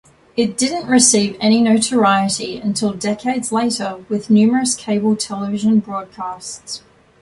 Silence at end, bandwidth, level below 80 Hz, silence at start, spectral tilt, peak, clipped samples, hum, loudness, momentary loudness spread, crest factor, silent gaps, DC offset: 0.45 s; 11.5 kHz; -56 dBFS; 0.35 s; -3.5 dB/octave; 0 dBFS; under 0.1%; none; -16 LUFS; 15 LU; 18 dB; none; under 0.1%